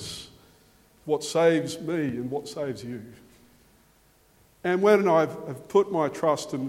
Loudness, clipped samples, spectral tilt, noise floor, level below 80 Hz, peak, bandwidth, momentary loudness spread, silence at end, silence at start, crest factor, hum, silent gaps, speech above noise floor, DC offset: -25 LUFS; under 0.1%; -5.5 dB/octave; -61 dBFS; -64 dBFS; -6 dBFS; 16 kHz; 17 LU; 0 s; 0 s; 20 dB; none; none; 36 dB; under 0.1%